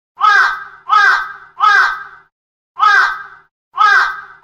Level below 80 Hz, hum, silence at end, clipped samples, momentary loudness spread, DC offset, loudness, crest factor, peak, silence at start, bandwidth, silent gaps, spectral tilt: -56 dBFS; none; 0.2 s; under 0.1%; 16 LU; under 0.1%; -11 LUFS; 14 dB; 0 dBFS; 0.2 s; 14 kHz; 2.32-2.75 s, 3.51-3.71 s; 1.5 dB/octave